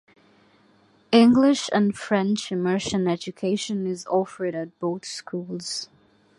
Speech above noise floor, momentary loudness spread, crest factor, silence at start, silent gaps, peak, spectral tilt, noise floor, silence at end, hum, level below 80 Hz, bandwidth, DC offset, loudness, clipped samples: 36 dB; 15 LU; 20 dB; 1.1 s; none; -4 dBFS; -5 dB/octave; -59 dBFS; 0.55 s; none; -62 dBFS; 11.5 kHz; under 0.1%; -23 LUFS; under 0.1%